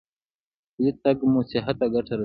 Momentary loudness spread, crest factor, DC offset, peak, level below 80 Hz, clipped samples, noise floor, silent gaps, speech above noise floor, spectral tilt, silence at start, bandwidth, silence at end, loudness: 5 LU; 16 dB; under 0.1%; -8 dBFS; -56 dBFS; under 0.1%; under -90 dBFS; none; over 67 dB; -11 dB/octave; 0.8 s; 5.2 kHz; 0 s; -24 LUFS